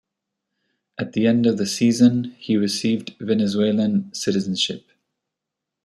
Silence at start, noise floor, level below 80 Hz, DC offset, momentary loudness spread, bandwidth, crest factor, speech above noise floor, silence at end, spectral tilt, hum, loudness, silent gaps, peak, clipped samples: 1 s; -84 dBFS; -64 dBFS; under 0.1%; 9 LU; 13.5 kHz; 18 dB; 64 dB; 1.05 s; -5 dB/octave; none; -20 LUFS; none; -4 dBFS; under 0.1%